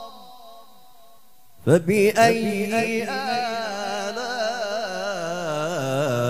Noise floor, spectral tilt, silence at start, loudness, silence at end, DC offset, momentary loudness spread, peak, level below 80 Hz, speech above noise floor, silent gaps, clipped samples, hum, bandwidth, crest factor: -56 dBFS; -5 dB/octave; 0 s; -23 LUFS; 0 s; 0.5%; 10 LU; -4 dBFS; -66 dBFS; 37 dB; none; under 0.1%; none; 16 kHz; 20 dB